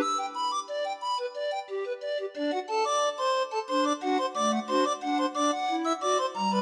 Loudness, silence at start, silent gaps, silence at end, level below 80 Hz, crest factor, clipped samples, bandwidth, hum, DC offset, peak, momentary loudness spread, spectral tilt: -29 LUFS; 0 s; none; 0 s; -84 dBFS; 14 dB; under 0.1%; 12 kHz; none; under 0.1%; -14 dBFS; 6 LU; -3 dB/octave